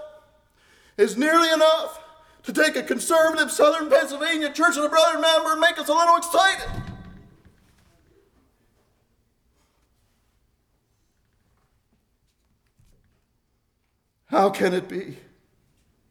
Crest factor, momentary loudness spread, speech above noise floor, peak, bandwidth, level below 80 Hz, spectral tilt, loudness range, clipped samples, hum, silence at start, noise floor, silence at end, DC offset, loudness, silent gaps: 18 dB; 17 LU; 51 dB; -6 dBFS; 19.5 kHz; -52 dBFS; -3 dB/octave; 9 LU; under 0.1%; none; 0 s; -71 dBFS; 0.95 s; under 0.1%; -20 LUFS; none